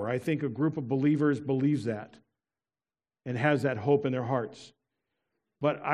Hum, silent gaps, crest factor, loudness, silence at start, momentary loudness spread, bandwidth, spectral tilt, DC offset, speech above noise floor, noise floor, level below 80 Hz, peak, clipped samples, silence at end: none; none; 20 dB; -29 LUFS; 0 s; 9 LU; 11 kHz; -8 dB/octave; under 0.1%; over 62 dB; under -90 dBFS; -74 dBFS; -10 dBFS; under 0.1%; 0 s